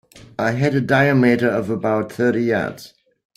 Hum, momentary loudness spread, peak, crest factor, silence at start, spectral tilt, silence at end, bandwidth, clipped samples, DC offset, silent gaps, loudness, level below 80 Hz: none; 10 LU; -4 dBFS; 16 dB; 0.15 s; -7.5 dB/octave; 0.5 s; 15 kHz; under 0.1%; under 0.1%; none; -18 LUFS; -56 dBFS